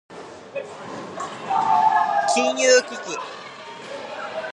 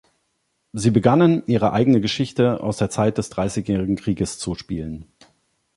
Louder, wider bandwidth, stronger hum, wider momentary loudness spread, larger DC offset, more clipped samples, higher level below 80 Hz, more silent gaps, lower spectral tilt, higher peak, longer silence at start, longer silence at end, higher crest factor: about the same, -21 LUFS vs -20 LUFS; about the same, 11 kHz vs 11.5 kHz; neither; first, 19 LU vs 13 LU; neither; neither; second, -70 dBFS vs -46 dBFS; neither; second, -1.5 dB/octave vs -6.5 dB/octave; about the same, -4 dBFS vs -2 dBFS; second, 0.1 s vs 0.75 s; second, 0 s vs 0.75 s; about the same, 18 dB vs 20 dB